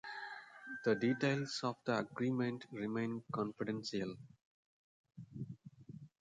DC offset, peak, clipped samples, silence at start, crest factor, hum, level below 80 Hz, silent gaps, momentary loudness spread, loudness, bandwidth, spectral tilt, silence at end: under 0.1%; -22 dBFS; under 0.1%; 0.05 s; 20 dB; none; -78 dBFS; 4.45-5.04 s; 20 LU; -39 LUFS; 9.4 kHz; -6 dB/octave; 0.15 s